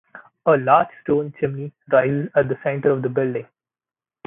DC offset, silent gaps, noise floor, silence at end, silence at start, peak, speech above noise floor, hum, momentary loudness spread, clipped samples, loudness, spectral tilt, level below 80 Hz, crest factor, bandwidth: under 0.1%; none; under -90 dBFS; 0.85 s; 0.15 s; -2 dBFS; over 70 dB; none; 9 LU; under 0.1%; -20 LUFS; -12 dB/octave; -60 dBFS; 20 dB; 3.8 kHz